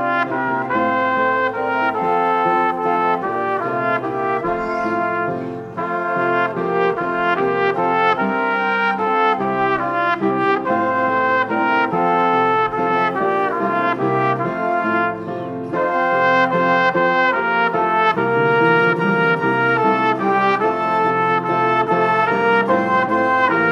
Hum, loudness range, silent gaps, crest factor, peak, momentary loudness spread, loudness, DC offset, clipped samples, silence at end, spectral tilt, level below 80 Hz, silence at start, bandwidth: none; 4 LU; none; 16 dB; -2 dBFS; 5 LU; -17 LUFS; under 0.1%; under 0.1%; 0 s; -7 dB/octave; -56 dBFS; 0 s; 9.8 kHz